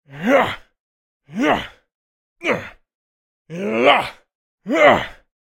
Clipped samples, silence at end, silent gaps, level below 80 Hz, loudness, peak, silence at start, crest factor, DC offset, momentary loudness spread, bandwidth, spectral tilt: under 0.1%; 0.3 s; 0.80-1.20 s, 1.95-2.36 s, 2.95-3.45 s, 4.35-4.58 s; -52 dBFS; -18 LUFS; 0 dBFS; 0.1 s; 20 dB; under 0.1%; 21 LU; 16.5 kHz; -5 dB/octave